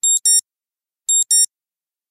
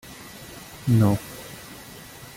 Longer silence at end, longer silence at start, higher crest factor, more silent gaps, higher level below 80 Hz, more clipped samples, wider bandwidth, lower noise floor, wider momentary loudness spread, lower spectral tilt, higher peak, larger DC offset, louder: first, 0.65 s vs 0.1 s; about the same, 0.05 s vs 0.05 s; second, 14 dB vs 20 dB; neither; second, under -90 dBFS vs -52 dBFS; neither; about the same, 16 kHz vs 17 kHz; first, under -90 dBFS vs -43 dBFS; second, 7 LU vs 21 LU; second, 7.5 dB/octave vs -7 dB/octave; about the same, -6 dBFS vs -6 dBFS; neither; first, -14 LUFS vs -22 LUFS